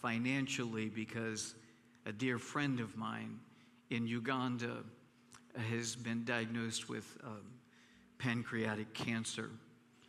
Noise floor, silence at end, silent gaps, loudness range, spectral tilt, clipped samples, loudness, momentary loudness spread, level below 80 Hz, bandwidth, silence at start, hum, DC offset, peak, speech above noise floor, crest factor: -65 dBFS; 0.05 s; none; 2 LU; -4.5 dB/octave; under 0.1%; -40 LUFS; 13 LU; -80 dBFS; 14 kHz; 0 s; none; under 0.1%; -20 dBFS; 25 dB; 22 dB